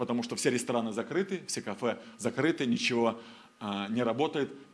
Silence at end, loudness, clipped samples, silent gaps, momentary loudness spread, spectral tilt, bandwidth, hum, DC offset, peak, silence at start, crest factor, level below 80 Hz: 0.1 s; -31 LUFS; under 0.1%; none; 8 LU; -4.5 dB/octave; 11 kHz; none; under 0.1%; -12 dBFS; 0 s; 20 dB; -78 dBFS